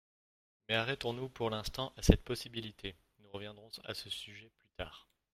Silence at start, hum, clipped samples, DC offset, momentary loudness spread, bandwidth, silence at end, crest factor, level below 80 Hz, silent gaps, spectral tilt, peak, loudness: 0.7 s; none; under 0.1%; under 0.1%; 19 LU; 16 kHz; 0.35 s; 34 dB; -44 dBFS; none; -5 dB/octave; -4 dBFS; -37 LUFS